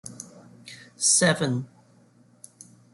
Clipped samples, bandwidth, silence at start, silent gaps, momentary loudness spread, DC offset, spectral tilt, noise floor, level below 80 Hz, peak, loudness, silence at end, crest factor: under 0.1%; 12 kHz; 0.05 s; none; 26 LU; under 0.1%; -3 dB/octave; -58 dBFS; -68 dBFS; -8 dBFS; -22 LUFS; 1.25 s; 20 dB